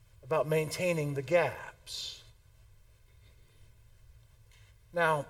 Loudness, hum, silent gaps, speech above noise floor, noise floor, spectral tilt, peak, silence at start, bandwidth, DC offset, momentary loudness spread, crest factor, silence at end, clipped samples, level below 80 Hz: -32 LUFS; none; none; 29 dB; -59 dBFS; -5 dB/octave; -14 dBFS; 0.25 s; 17 kHz; under 0.1%; 12 LU; 22 dB; 0 s; under 0.1%; -62 dBFS